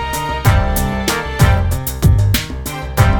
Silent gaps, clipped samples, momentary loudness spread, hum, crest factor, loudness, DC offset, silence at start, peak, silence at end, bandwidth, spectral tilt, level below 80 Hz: none; under 0.1%; 7 LU; none; 14 dB; -16 LUFS; under 0.1%; 0 s; 0 dBFS; 0 s; 20 kHz; -5 dB/octave; -20 dBFS